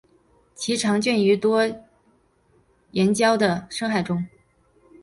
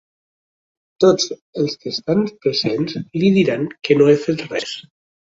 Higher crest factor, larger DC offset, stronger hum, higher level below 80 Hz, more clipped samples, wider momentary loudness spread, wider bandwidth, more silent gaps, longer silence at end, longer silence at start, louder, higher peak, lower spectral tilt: about the same, 18 dB vs 18 dB; neither; neither; about the same, -60 dBFS vs -60 dBFS; neither; about the same, 11 LU vs 10 LU; first, 11.5 kHz vs 8 kHz; second, none vs 1.41-1.53 s; first, 0.75 s vs 0.5 s; second, 0.6 s vs 1 s; second, -22 LUFS vs -18 LUFS; second, -6 dBFS vs -2 dBFS; about the same, -5 dB/octave vs -5.5 dB/octave